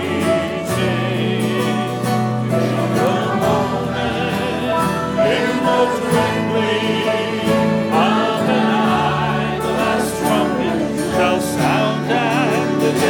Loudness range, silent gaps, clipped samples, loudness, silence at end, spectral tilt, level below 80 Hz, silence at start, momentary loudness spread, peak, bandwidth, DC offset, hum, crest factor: 2 LU; none; under 0.1%; -17 LUFS; 0 s; -5.5 dB/octave; -46 dBFS; 0 s; 4 LU; -4 dBFS; 19 kHz; under 0.1%; none; 14 dB